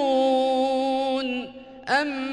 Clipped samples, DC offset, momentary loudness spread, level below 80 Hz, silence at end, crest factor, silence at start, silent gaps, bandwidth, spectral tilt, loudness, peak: under 0.1%; under 0.1%; 12 LU; -62 dBFS; 0 s; 14 dB; 0 s; none; 10 kHz; -3.5 dB/octave; -24 LUFS; -10 dBFS